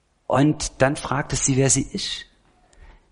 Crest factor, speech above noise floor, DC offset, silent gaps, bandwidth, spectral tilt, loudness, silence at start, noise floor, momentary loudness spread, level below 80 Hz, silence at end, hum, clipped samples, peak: 20 dB; 36 dB; under 0.1%; none; 11 kHz; -4 dB/octave; -21 LUFS; 0.3 s; -57 dBFS; 9 LU; -42 dBFS; 0.2 s; none; under 0.1%; -4 dBFS